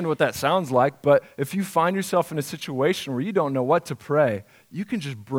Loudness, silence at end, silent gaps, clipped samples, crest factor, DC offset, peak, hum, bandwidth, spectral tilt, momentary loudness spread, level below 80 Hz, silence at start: -23 LUFS; 0 s; none; under 0.1%; 18 dB; under 0.1%; -4 dBFS; none; 17.5 kHz; -5.5 dB/octave; 9 LU; -66 dBFS; 0 s